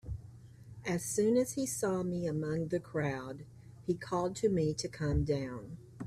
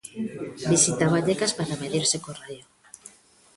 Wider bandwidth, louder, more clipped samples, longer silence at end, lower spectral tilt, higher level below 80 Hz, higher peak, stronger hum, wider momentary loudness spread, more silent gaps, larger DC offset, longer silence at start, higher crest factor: first, 15.5 kHz vs 11.5 kHz; second, -34 LUFS vs -24 LUFS; neither; second, 0 s vs 0.5 s; first, -5.5 dB/octave vs -3.5 dB/octave; first, -52 dBFS vs -60 dBFS; second, -18 dBFS vs -6 dBFS; neither; second, 17 LU vs 22 LU; neither; neither; about the same, 0.05 s vs 0.05 s; about the same, 16 dB vs 20 dB